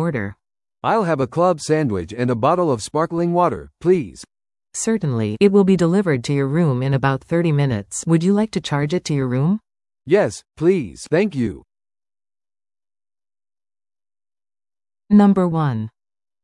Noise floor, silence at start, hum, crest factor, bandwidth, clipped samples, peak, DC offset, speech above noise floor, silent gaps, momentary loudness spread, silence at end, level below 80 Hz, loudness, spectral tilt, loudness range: under -90 dBFS; 0 s; none; 16 dB; 11.5 kHz; under 0.1%; -2 dBFS; under 0.1%; over 72 dB; none; 9 LU; 0.55 s; -52 dBFS; -19 LUFS; -6.5 dB/octave; 6 LU